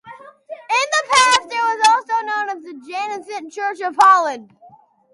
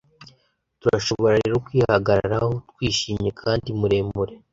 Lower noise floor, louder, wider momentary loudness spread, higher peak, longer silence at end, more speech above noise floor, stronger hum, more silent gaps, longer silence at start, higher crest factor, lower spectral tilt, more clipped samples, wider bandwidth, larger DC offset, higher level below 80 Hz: second, -49 dBFS vs -64 dBFS; first, -16 LUFS vs -22 LUFS; first, 18 LU vs 7 LU; about the same, -2 dBFS vs -2 dBFS; first, 0.7 s vs 0.15 s; second, 32 dB vs 43 dB; neither; neither; second, 0.05 s vs 0.2 s; about the same, 18 dB vs 20 dB; second, 0.5 dB/octave vs -5.5 dB/octave; neither; first, 11.5 kHz vs 7.8 kHz; neither; second, -66 dBFS vs -44 dBFS